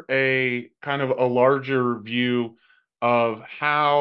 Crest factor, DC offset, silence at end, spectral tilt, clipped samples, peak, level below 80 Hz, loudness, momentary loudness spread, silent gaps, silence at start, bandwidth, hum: 16 dB; under 0.1%; 0 s; -8.5 dB/octave; under 0.1%; -6 dBFS; -76 dBFS; -22 LUFS; 7 LU; none; 0.1 s; 5.6 kHz; none